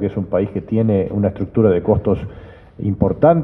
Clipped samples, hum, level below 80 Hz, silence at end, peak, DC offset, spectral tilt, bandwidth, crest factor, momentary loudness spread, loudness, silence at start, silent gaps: under 0.1%; none; -38 dBFS; 0 s; 0 dBFS; under 0.1%; -12 dB/octave; 3.8 kHz; 16 dB; 9 LU; -18 LUFS; 0 s; none